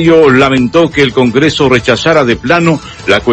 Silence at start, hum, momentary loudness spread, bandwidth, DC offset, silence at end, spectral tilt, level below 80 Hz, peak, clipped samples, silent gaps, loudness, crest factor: 0 s; none; 5 LU; 9 kHz; under 0.1%; 0 s; -5.5 dB/octave; -34 dBFS; 0 dBFS; 1%; none; -8 LUFS; 8 dB